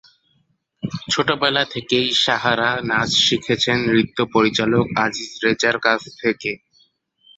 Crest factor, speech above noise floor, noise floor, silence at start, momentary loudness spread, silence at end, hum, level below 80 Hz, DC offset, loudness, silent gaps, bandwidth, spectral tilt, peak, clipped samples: 18 dB; 46 dB; -65 dBFS; 0.85 s; 7 LU; 0.8 s; none; -54 dBFS; under 0.1%; -18 LUFS; none; 8.2 kHz; -3.5 dB/octave; -2 dBFS; under 0.1%